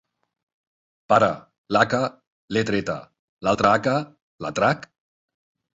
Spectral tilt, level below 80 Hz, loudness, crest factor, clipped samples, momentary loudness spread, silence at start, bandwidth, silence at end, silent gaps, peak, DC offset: -5.5 dB/octave; -56 dBFS; -22 LUFS; 22 dB; under 0.1%; 13 LU; 1.1 s; 8 kHz; 0.95 s; 1.58-1.64 s, 2.27-2.48 s, 3.19-3.37 s, 4.22-4.39 s; -2 dBFS; under 0.1%